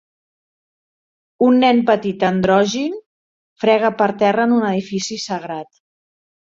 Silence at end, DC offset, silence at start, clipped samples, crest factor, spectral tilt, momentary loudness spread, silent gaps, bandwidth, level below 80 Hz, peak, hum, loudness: 0.95 s; under 0.1%; 1.4 s; under 0.1%; 16 dB; -5.5 dB/octave; 12 LU; 3.06-3.56 s; 7.6 kHz; -58 dBFS; -2 dBFS; none; -17 LUFS